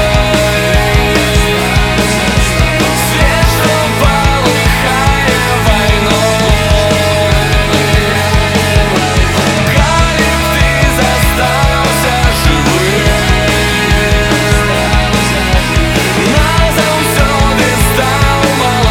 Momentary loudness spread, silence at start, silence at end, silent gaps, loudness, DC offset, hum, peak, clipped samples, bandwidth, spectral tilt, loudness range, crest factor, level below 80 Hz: 1 LU; 0 s; 0 s; none; -10 LUFS; under 0.1%; none; 0 dBFS; under 0.1%; 18 kHz; -4.5 dB/octave; 0 LU; 10 dB; -16 dBFS